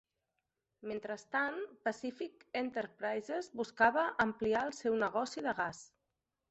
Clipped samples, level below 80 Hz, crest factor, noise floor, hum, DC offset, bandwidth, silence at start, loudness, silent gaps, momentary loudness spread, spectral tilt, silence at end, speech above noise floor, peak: under 0.1%; -72 dBFS; 22 dB; -87 dBFS; none; under 0.1%; 8.2 kHz; 0.85 s; -36 LUFS; none; 12 LU; -4.5 dB/octave; 0.65 s; 51 dB; -14 dBFS